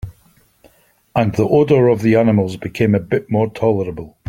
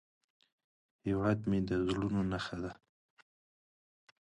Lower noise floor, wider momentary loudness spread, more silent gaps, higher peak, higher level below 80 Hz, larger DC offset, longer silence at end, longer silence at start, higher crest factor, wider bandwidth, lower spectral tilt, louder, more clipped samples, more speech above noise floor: second, -54 dBFS vs under -90 dBFS; about the same, 10 LU vs 11 LU; neither; first, 0 dBFS vs -18 dBFS; first, -46 dBFS vs -56 dBFS; neither; second, 0.2 s vs 1.45 s; second, 0.05 s vs 1.05 s; about the same, 16 dB vs 18 dB; first, 15.5 kHz vs 10.5 kHz; about the same, -8.5 dB/octave vs -7.5 dB/octave; first, -16 LUFS vs -35 LUFS; neither; second, 39 dB vs over 56 dB